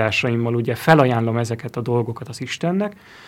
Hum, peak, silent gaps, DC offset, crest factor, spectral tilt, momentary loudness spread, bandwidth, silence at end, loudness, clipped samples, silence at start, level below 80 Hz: none; 0 dBFS; none; under 0.1%; 20 dB; -6.5 dB/octave; 13 LU; 16 kHz; 0 s; -20 LUFS; under 0.1%; 0 s; -58 dBFS